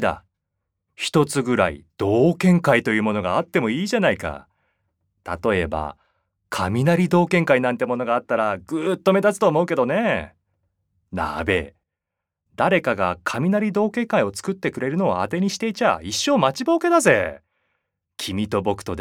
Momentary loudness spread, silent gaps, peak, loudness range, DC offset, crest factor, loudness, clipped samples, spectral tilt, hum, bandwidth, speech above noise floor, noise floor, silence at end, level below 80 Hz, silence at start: 10 LU; none; -2 dBFS; 5 LU; under 0.1%; 20 dB; -21 LUFS; under 0.1%; -5.5 dB/octave; none; 16.5 kHz; 64 dB; -84 dBFS; 0 s; -52 dBFS; 0 s